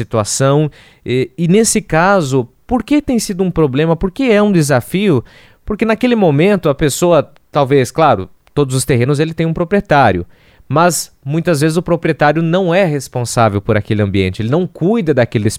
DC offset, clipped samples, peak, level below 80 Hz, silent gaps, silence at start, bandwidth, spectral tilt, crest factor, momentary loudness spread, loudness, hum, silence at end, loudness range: under 0.1%; under 0.1%; 0 dBFS; -38 dBFS; none; 0 s; 16 kHz; -5.5 dB/octave; 14 dB; 7 LU; -14 LUFS; none; 0 s; 1 LU